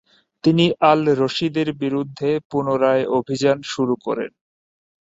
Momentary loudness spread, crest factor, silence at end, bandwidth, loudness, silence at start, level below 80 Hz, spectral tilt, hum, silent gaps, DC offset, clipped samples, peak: 8 LU; 18 dB; 0.8 s; 8 kHz; -20 LUFS; 0.45 s; -62 dBFS; -6 dB/octave; none; 2.45-2.50 s; under 0.1%; under 0.1%; -2 dBFS